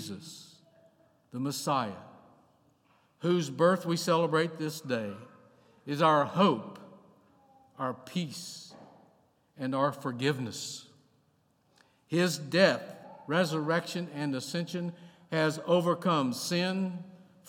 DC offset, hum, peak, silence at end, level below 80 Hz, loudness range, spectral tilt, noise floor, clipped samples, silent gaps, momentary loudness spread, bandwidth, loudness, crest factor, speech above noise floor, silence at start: under 0.1%; none; -8 dBFS; 0.3 s; -84 dBFS; 6 LU; -5 dB/octave; -70 dBFS; under 0.1%; none; 19 LU; 17 kHz; -30 LUFS; 24 dB; 40 dB; 0 s